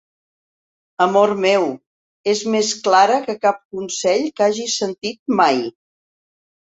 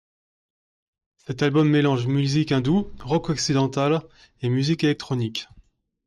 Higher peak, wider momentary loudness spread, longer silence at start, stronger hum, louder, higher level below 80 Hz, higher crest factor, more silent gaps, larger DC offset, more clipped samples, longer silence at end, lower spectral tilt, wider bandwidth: first, -2 dBFS vs -10 dBFS; first, 12 LU vs 8 LU; second, 1 s vs 1.3 s; neither; first, -18 LUFS vs -22 LUFS; second, -66 dBFS vs -52 dBFS; about the same, 18 dB vs 14 dB; first, 1.86-2.24 s, 3.65-3.70 s, 5.19-5.26 s vs none; neither; neither; first, 0.95 s vs 0.65 s; second, -3 dB/octave vs -6 dB/octave; second, 8.2 kHz vs 11 kHz